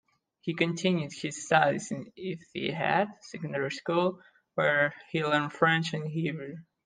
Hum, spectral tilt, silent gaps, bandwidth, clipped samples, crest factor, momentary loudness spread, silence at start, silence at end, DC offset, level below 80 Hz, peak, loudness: none; -5 dB/octave; none; 9.8 kHz; under 0.1%; 22 dB; 13 LU; 0.45 s; 0.25 s; under 0.1%; -74 dBFS; -8 dBFS; -29 LUFS